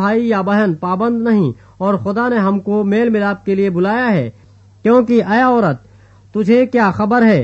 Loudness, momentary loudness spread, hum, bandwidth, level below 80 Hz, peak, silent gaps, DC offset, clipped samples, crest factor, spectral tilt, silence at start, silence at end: -15 LUFS; 7 LU; none; 7.6 kHz; -52 dBFS; -2 dBFS; none; under 0.1%; under 0.1%; 12 dB; -8.5 dB/octave; 0 s; 0 s